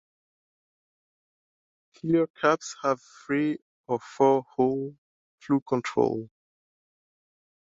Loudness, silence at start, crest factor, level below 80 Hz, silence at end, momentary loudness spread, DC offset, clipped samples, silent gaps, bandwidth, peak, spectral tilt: -27 LUFS; 2.05 s; 22 dB; -70 dBFS; 1.4 s; 12 LU; under 0.1%; under 0.1%; 2.30-2.34 s, 3.62-3.84 s, 4.98-5.38 s, 5.62-5.66 s; 7.8 kHz; -8 dBFS; -6 dB/octave